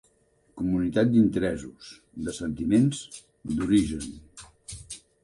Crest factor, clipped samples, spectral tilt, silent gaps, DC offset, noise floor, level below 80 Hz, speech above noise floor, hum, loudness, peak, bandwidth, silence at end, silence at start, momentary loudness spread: 16 dB; under 0.1%; -6.5 dB/octave; none; under 0.1%; -65 dBFS; -48 dBFS; 40 dB; none; -26 LUFS; -10 dBFS; 11.5 kHz; 0.25 s; 0.55 s; 21 LU